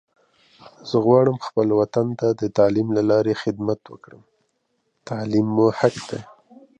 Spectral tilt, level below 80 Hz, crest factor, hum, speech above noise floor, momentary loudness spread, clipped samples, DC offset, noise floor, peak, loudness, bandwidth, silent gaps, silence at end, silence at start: -7.5 dB/octave; -60 dBFS; 20 dB; none; 51 dB; 14 LU; under 0.1%; under 0.1%; -71 dBFS; -2 dBFS; -20 LUFS; 9.4 kHz; none; 0.55 s; 0.65 s